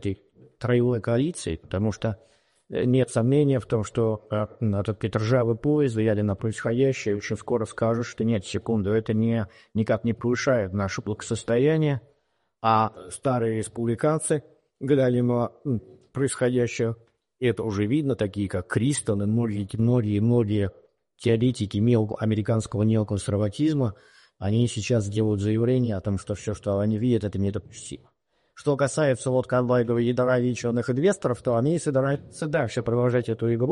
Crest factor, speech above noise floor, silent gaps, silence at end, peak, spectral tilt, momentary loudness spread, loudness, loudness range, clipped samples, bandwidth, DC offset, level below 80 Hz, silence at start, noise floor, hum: 16 dB; 48 dB; none; 0 s; -8 dBFS; -7 dB/octave; 8 LU; -25 LUFS; 2 LU; under 0.1%; 11.5 kHz; under 0.1%; -54 dBFS; 0 s; -72 dBFS; none